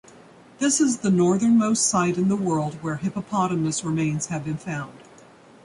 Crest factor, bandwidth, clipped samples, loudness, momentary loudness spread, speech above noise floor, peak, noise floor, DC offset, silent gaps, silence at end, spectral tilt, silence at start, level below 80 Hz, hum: 16 dB; 11.5 kHz; under 0.1%; -23 LUFS; 10 LU; 27 dB; -8 dBFS; -49 dBFS; under 0.1%; none; 0.65 s; -5 dB/octave; 0.6 s; -60 dBFS; none